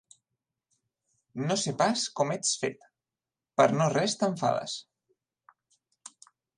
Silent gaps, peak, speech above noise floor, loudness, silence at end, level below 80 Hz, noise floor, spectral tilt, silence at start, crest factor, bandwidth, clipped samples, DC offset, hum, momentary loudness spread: none; -8 dBFS; over 63 dB; -28 LUFS; 1.75 s; -76 dBFS; under -90 dBFS; -4 dB/octave; 1.35 s; 22 dB; 11.5 kHz; under 0.1%; under 0.1%; none; 14 LU